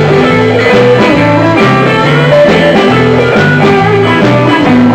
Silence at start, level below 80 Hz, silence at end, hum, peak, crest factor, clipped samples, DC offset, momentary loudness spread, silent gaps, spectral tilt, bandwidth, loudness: 0 s; -36 dBFS; 0 s; none; 0 dBFS; 6 dB; under 0.1%; under 0.1%; 2 LU; none; -7 dB/octave; 15 kHz; -6 LUFS